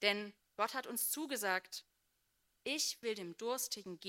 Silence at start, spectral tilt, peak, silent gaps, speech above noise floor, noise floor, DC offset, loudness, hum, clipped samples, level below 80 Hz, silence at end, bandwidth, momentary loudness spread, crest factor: 0 s; -1 dB/octave; -16 dBFS; none; 41 dB; -80 dBFS; under 0.1%; -39 LUFS; none; under 0.1%; -88 dBFS; 0 s; 16 kHz; 10 LU; 24 dB